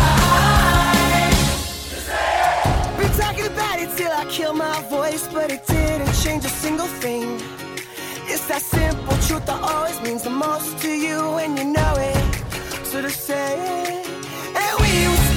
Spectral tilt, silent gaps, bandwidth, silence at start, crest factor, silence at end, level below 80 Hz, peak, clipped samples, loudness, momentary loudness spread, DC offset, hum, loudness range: -4 dB/octave; none; 19 kHz; 0 s; 16 dB; 0 s; -28 dBFS; -4 dBFS; under 0.1%; -20 LUFS; 11 LU; under 0.1%; none; 5 LU